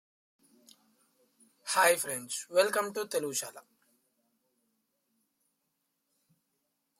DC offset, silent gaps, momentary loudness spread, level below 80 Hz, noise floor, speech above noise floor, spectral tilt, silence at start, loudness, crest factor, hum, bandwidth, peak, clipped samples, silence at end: under 0.1%; none; 11 LU; -88 dBFS; -81 dBFS; 51 dB; -1 dB/octave; 1.65 s; -30 LUFS; 24 dB; none; 16.5 kHz; -12 dBFS; under 0.1%; 3.4 s